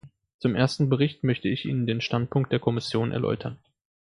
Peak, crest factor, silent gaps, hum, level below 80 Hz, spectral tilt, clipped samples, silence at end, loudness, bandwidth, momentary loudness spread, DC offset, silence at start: -6 dBFS; 20 dB; 0.34-0.39 s; none; -58 dBFS; -7 dB/octave; under 0.1%; 0.65 s; -26 LUFS; 11 kHz; 5 LU; under 0.1%; 0.05 s